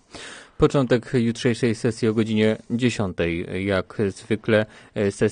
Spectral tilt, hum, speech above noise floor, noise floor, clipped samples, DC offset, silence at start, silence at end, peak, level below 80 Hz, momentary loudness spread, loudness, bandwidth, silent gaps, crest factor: -6.5 dB/octave; none; 19 dB; -41 dBFS; under 0.1%; under 0.1%; 0.15 s; 0 s; -4 dBFS; -48 dBFS; 6 LU; -23 LUFS; 10 kHz; none; 18 dB